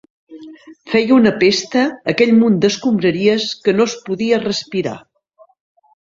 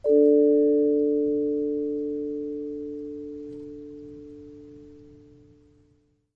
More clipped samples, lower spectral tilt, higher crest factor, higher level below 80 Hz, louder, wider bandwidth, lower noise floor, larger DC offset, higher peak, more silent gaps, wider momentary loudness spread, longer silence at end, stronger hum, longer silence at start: neither; second, -5 dB/octave vs -10.5 dB/octave; about the same, 16 dB vs 16 dB; first, -56 dBFS vs -62 dBFS; first, -15 LUFS vs -24 LUFS; first, 7.6 kHz vs 1.9 kHz; second, -51 dBFS vs -65 dBFS; neither; first, 0 dBFS vs -10 dBFS; neither; second, 9 LU vs 24 LU; second, 1.05 s vs 1.35 s; neither; first, 0.3 s vs 0.05 s